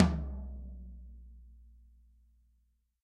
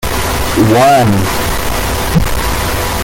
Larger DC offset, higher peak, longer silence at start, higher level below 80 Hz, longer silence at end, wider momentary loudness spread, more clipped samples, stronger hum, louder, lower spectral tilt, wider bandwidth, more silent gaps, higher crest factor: neither; second, -8 dBFS vs 0 dBFS; about the same, 0 s vs 0 s; second, -44 dBFS vs -22 dBFS; first, 1.3 s vs 0 s; first, 22 LU vs 8 LU; neither; first, 60 Hz at -60 dBFS vs none; second, -38 LUFS vs -12 LUFS; first, -8 dB/octave vs -4.5 dB/octave; second, 8.4 kHz vs 17 kHz; neither; first, 28 dB vs 10 dB